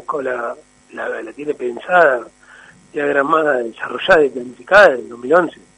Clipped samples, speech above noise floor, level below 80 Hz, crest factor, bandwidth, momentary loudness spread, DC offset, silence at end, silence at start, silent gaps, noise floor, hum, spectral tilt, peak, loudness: under 0.1%; 28 dB; -52 dBFS; 16 dB; 10.5 kHz; 16 LU; under 0.1%; 0.3 s; 0.1 s; none; -44 dBFS; none; -4.5 dB/octave; 0 dBFS; -16 LUFS